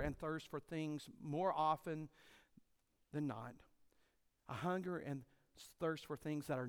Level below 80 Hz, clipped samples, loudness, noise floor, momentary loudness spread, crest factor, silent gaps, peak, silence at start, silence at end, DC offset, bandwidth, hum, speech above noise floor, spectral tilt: -66 dBFS; under 0.1%; -44 LUFS; -79 dBFS; 14 LU; 20 dB; none; -26 dBFS; 0 s; 0 s; under 0.1%; 17.5 kHz; none; 36 dB; -6.5 dB/octave